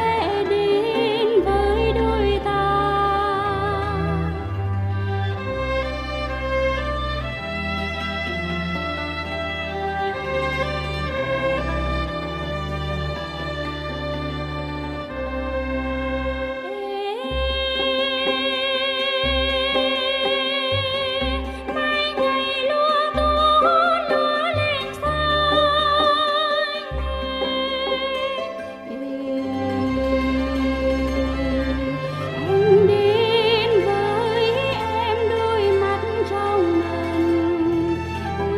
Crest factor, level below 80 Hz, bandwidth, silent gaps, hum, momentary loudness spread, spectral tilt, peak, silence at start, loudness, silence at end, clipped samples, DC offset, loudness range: 16 dB; -34 dBFS; 14 kHz; none; none; 10 LU; -6 dB/octave; -6 dBFS; 0 s; -21 LUFS; 0 s; under 0.1%; under 0.1%; 7 LU